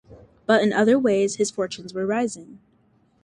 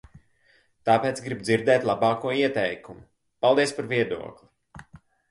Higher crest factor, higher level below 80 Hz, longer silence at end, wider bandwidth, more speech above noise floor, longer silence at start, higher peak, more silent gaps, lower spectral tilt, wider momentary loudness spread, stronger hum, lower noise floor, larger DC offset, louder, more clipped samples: about the same, 18 dB vs 20 dB; about the same, -64 dBFS vs -62 dBFS; first, 0.7 s vs 0.35 s; about the same, 11 kHz vs 11.5 kHz; about the same, 40 dB vs 39 dB; second, 0.1 s vs 0.85 s; about the same, -4 dBFS vs -6 dBFS; neither; about the same, -4.5 dB/octave vs -5 dB/octave; about the same, 11 LU vs 10 LU; neither; about the same, -61 dBFS vs -63 dBFS; neither; about the same, -22 LUFS vs -24 LUFS; neither